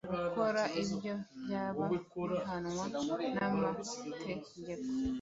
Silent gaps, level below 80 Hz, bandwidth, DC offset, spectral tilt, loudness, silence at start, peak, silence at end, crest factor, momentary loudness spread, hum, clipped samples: none; -62 dBFS; 8 kHz; under 0.1%; -5 dB/octave; -37 LUFS; 0.05 s; -20 dBFS; 0 s; 18 dB; 9 LU; none; under 0.1%